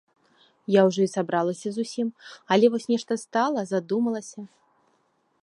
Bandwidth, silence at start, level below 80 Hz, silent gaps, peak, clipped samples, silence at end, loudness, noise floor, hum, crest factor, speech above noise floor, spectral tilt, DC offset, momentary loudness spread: 11.5 kHz; 0.7 s; -78 dBFS; none; -6 dBFS; under 0.1%; 0.95 s; -25 LUFS; -69 dBFS; none; 20 dB; 44 dB; -5.5 dB/octave; under 0.1%; 19 LU